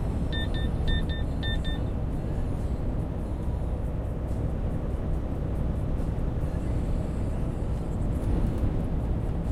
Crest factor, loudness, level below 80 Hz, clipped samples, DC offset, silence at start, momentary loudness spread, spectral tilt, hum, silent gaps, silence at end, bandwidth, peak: 14 dB; -31 LUFS; -30 dBFS; under 0.1%; under 0.1%; 0 s; 3 LU; -7.5 dB/octave; none; none; 0 s; 11.5 kHz; -14 dBFS